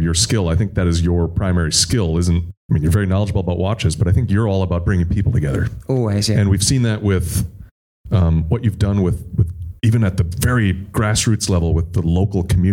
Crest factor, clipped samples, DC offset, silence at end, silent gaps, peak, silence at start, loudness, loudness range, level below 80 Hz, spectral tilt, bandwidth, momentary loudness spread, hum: 14 dB; under 0.1%; under 0.1%; 0 s; 2.57-2.69 s, 7.71-8.04 s; -2 dBFS; 0 s; -18 LUFS; 1 LU; -30 dBFS; -5.5 dB/octave; 16.5 kHz; 5 LU; none